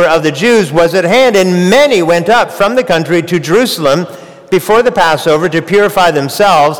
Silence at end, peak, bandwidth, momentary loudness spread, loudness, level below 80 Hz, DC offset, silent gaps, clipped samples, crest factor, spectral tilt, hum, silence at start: 0 s; -2 dBFS; over 20 kHz; 5 LU; -9 LUFS; -42 dBFS; 1%; none; under 0.1%; 8 dB; -4.5 dB/octave; none; 0 s